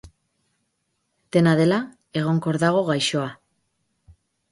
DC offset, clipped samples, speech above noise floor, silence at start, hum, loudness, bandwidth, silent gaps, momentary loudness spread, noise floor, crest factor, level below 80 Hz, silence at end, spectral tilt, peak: under 0.1%; under 0.1%; 54 dB; 0.05 s; none; -22 LUFS; 11.5 kHz; none; 10 LU; -74 dBFS; 18 dB; -60 dBFS; 1.15 s; -6 dB/octave; -6 dBFS